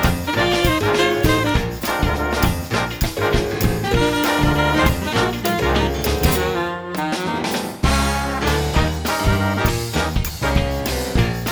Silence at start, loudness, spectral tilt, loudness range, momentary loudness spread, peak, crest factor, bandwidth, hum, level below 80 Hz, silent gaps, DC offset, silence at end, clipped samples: 0 s; -19 LUFS; -5 dB/octave; 2 LU; 5 LU; 0 dBFS; 18 dB; over 20 kHz; none; -26 dBFS; none; under 0.1%; 0 s; under 0.1%